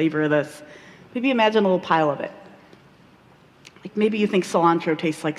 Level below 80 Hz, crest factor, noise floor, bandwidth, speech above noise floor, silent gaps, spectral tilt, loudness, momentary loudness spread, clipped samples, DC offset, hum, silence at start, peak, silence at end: -68 dBFS; 18 dB; -52 dBFS; 13 kHz; 31 dB; none; -6 dB/octave; -21 LUFS; 15 LU; under 0.1%; under 0.1%; none; 0 s; -4 dBFS; 0 s